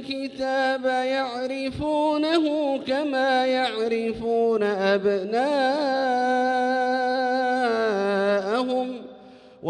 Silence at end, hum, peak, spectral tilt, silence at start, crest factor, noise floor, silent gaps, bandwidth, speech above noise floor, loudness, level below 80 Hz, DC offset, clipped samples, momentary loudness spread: 0 s; none; -8 dBFS; -5 dB/octave; 0 s; 14 dB; -47 dBFS; none; 10 kHz; 24 dB; -23 LUFS; -58 dBFS; under 0.1%; under 0.1%; 6 LU